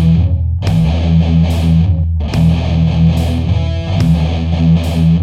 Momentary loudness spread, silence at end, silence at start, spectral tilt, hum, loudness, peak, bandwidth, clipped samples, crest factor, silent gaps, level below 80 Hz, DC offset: 4 LU; 0 s; 0 s; -8 dB/octave; none; -13 LUFS; -2 dBFS; 9 kHz; under 0.1%; 10 dB; none; -20 dBFS; under 0.1%